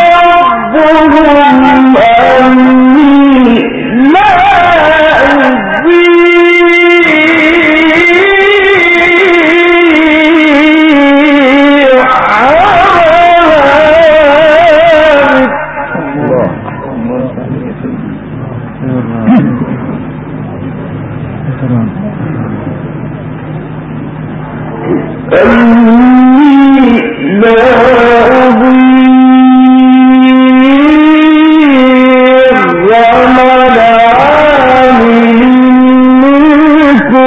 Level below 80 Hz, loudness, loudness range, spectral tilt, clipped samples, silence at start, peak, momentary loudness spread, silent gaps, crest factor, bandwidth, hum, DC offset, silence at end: -34 dBFS; -4 LUFS; 11 LU; -7 dB/octave; 3%; 0 s; 0 dBFS; 15 LU; none; 4 dB; 8 kHz; none; under 0.1%; 0 s